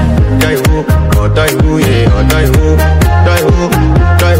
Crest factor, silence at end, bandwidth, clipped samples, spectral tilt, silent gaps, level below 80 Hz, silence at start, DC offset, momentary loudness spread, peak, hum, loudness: 8 dB; 0 s; 16.5 kHz; 0.2%; -6 dB/octave; none; -12 dBFS; 0 s; under 0.1%; 2 LU; 0 dBFS; none; -9 LUFS